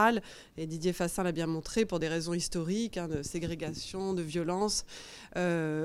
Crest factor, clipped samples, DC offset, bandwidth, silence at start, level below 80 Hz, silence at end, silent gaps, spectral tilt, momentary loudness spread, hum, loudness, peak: 20 dB; under 0.1%; under 0.1%; 15.5 kHz; 0 s; -54 dBFS; 0 s; none; -4.5 dB/octave; 8 LU; none; -33 LUFS; -12 dBFS